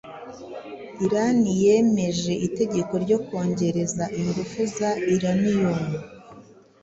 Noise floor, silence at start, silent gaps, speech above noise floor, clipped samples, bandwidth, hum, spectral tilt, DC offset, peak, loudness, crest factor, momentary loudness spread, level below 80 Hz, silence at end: -48 dBFS; 0.05 s; none; 26 dB; under 0.1%; 8 kHz; none; -6 dB/octave; under 0.1%; -8 dBFS; -23 LUFS; 16 dB; 18 LU; -56 dBFS; 0.4 s